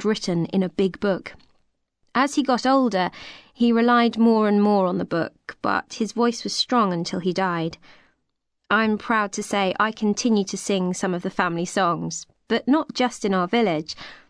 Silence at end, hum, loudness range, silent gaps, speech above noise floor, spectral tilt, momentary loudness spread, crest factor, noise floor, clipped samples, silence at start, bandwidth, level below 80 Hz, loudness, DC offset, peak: 0.15 s; none; 4 LU; none; 53 dB; -5 dB/octave; 9 LU; 16 dB; -75 dBFS; under 0.1%; 0 s; 11 kHz; -60 dBFS; -22 LUFS; under 0.1%; -6 dBFS